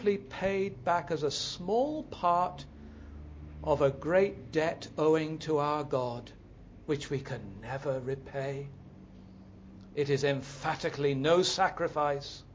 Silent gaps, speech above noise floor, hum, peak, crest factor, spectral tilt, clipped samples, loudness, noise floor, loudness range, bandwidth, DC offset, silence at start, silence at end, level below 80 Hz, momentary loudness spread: none; 21 dB; none; -14 dBFS; 18 dB; -5 dB/octave; under 0.1%; -31 LUFS; -51 dBFS; 7 LU; 8 kHz; under 0.1%; 0 s; 0 s; -54 dBFS; 19 LU